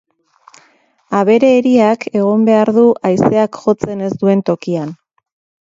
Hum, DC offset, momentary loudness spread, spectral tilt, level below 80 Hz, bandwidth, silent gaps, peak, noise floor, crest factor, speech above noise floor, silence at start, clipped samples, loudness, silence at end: none; under 0.1%; 9 LU; -7.5 dB/octave; -54 dBFS; 7.8 kHz; none; 0 dBFS; -54 dBFS; 14 dB; 41 dB; 1.1 s; under 0.1%; -13 LUFS; 0.65 s